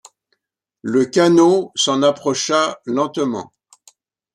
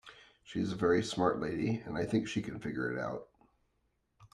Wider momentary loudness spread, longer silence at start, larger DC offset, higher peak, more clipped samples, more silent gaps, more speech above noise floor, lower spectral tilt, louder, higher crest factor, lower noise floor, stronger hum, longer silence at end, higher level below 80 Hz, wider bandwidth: about the same, 10 LU vs 9 LU; first, 0.85 s vs 0.05 s; neither; first, -2 dBFS vs -16 dBFS; neither; neither; first, 60 dB vs 44 dB; second, -4 dB/octave vs -6 dB/octave; first, -17 LUFS vs -34 LUFS; about the same, 16 dB vs 20 dB; about the same, -76 dBFS vs -78 dBFS; neither; first, 0.9 s vs 0.1 s; about the same, -66 dBFS vs -64 dBFS; about the same, 11.5 kHz vs 11.5 kHz